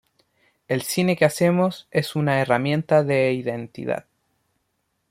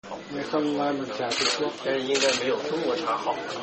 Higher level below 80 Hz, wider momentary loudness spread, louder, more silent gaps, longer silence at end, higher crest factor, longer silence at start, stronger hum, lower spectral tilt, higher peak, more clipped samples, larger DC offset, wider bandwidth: about the same, -64 dBFS vs -66 dBFS; first, 10 LU vs 6 LU; first, -22 LUFS vs -26 LUFS; neither; first, 1.1 s vs 0 s; about the same, 20 dB vs 18 dB; first, 0.7 s vs 0.05 s; neither; first, -6 dB/octave vs -2.5 dB/octave; first, -4 dBFS vs -8 dBFS; neither; neither; first, 16.5 kHz vs 8.6 kHz